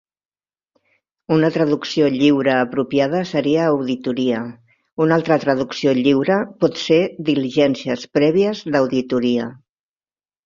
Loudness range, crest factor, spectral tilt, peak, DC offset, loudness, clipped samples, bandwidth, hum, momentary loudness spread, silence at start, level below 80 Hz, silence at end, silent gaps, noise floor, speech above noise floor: 1 LU; 16 dB; -6.5 dB/octave; -2 dBFS; under 0.1%; -18 LUFS; under 0.1%; 7.4 kHz; none; 6 LU; 1.3 s; -60 dBFS; 0.9 s; 4.93-4.97 s; under -90 dBFS; over 73 dB